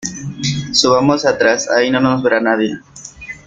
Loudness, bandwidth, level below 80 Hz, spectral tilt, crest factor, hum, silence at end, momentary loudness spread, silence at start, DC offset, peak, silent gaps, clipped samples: -14 LUFS; 9.4 kHz; -50 dBFS; -4 dB/octave; 16 dB; none; 0.1 s; 17 LU; 0 s; under 0.1%; 0 dBFS; none; under 0.1%